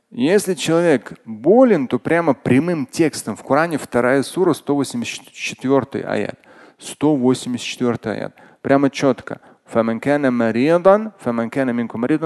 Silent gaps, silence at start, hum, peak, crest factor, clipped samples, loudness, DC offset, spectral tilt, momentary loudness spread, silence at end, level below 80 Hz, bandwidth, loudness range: none; 0.1 s; none; 0 dBFS; 18 dB; under 0.1%; -18 LUFS; under 0.1%; -5.5 dB/octave; 12 LU; 0 s; -58 dBFS; 12.5 kHz; 4 LU